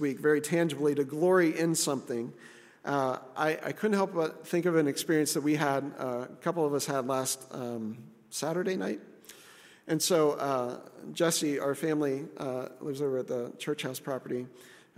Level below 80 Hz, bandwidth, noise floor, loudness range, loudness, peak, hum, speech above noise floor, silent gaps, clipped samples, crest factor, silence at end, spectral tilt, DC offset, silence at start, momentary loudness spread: -80 dBFS; 16 kHz; -55 dBFS; 4 LU; -30 LUFS; -12 dBFS; none; 25 dB; none; under 0.1%; 18 dB; 0.25 s; -4.5 dB/octave; under 0.1%; 0 s; 11 LU